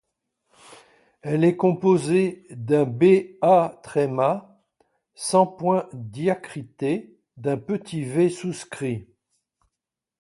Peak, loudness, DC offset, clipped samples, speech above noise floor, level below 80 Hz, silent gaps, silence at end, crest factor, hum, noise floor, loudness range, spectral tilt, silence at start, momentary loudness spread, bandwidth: -4 dBFS; -23 LUFS; under 0.1%; under 0.1%; 64 dB; -66 dBFS; none; 1.2 s; 20 dB; none; -86 dBFS; 7 LU; -6.5 dB/octave; 1.25 s; 13 LU; 11.5 kHz